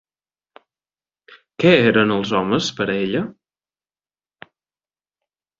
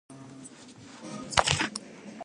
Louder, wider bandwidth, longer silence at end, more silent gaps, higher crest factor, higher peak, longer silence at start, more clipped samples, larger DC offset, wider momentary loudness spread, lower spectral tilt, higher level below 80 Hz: first, -18 LUFS vs -27 LUFS; second, 7.8 kHz vs 11.5 kHz; first, 2.3 s vs 0 s; neither; second, 20 dB vs 30 dB; about the same, -2 dBFS vs -2 dBFS; first, 1.6 s vs 0.1 s; neither; neither; second, 10 LU vs 23 LU; first, -5.5 dB/octave vs -2.5 dB/octave; about the same, -56 dBFS vs -52 dBFS